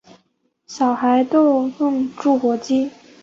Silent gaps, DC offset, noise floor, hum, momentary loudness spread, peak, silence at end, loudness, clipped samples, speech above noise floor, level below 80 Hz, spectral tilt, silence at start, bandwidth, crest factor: none; under 0.1%; -66 dBFS; none; 6 LU; -4 dBFS; 0.35 s; -18 LUFS; under 0.1%; 48 dB; -66 dBFS; -5 dB/octave; 0.7 s; 7.6 kHz; 14 dB